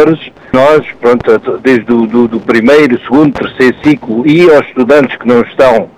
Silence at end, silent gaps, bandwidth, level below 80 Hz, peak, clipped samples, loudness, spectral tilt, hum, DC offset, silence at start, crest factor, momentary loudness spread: 0.1 s; none; 12.5 kHz; -42 dBFS; 0 dBFS; 0.4%; -8 LUFS; -7 dB/octave; none; under 0.1%; 0 s; 8 dB; 5 LU